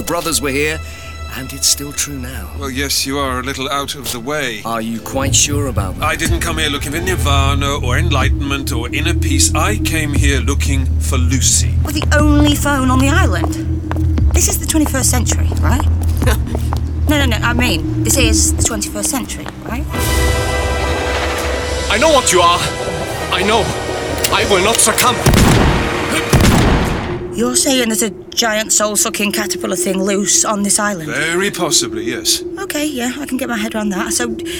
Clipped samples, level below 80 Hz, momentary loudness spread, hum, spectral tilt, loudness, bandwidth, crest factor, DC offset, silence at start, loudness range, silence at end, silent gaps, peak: under 0.1%; -22 dBFS; 9 LU; none; -3.5 dB/octave; -15 LUFS; over 20 kHz; 14 dB; 0.2%; 0 s; 4 LU; 0 s; none; 0 dBFS